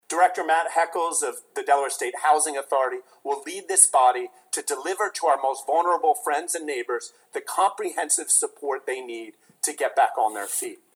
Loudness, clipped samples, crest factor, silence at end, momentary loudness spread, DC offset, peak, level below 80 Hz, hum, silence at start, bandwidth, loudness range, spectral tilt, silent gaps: -23 LUFS; under 0.1%; 22 dB; 0.2 s; 11 LU; under 0.1%; -2 dBFS; under -90 dBFS; none; 0.1 s; over 20 kHz; 3 LU; 1 dB/octave; none